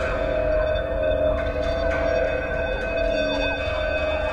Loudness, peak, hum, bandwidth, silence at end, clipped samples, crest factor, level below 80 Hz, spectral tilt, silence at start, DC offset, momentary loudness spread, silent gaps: -23 LUFS; -10 dBFS; none; 8.8 kHz; 0 s; under 0.1%; 12 dB; -32 dBFS; -6 dB/octave; 0 s; under 0.1%; 3 LU; none